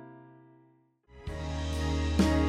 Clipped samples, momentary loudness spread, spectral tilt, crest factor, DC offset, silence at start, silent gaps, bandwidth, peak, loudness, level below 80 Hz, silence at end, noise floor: under 0.1%; 22 LU; -6 dB/octave; 18 dB; under 0.1%; 0 s; none; 12.5 kHz; -14 dBFS; -32 LUFS; -36 dBFS; 0 s; -65 dBFS